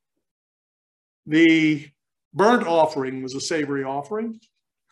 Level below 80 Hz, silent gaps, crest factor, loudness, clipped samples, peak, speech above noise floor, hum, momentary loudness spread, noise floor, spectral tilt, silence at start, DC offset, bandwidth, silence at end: -74 dBFS; 2.25-2.31 s; 20 dB; -21 LUFS; under 0.1%; -4 dBFS; over 69 dB; none; 13 LU; under -90 dBFS; -5 dB/octave; 1.25 s; under 0.1%; 11.5 kHz; 0.55 s